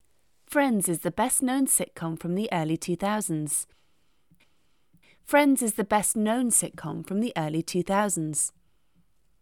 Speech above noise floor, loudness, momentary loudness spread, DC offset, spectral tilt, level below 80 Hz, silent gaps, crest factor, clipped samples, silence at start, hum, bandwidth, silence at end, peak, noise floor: 45 dB; -26 LUFS; 8 LU; under 0.1%; -4 dB/octave; -62 dBFS; none; 20 dB; under 0.1%; 0.5 s; none; 19 kHz; 0.95 s; -8 dBFS; -71 dBFS